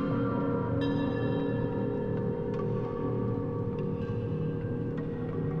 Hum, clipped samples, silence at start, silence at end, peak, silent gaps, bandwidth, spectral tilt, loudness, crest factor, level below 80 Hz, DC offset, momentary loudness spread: none; under 0.1%; 0 s; 0 s; -18 dBFS; none; 5.4 kHz; -10 dB/octave; -32 LUFS; 12 dB; -48 dBFS; under 0.1%; 4 LU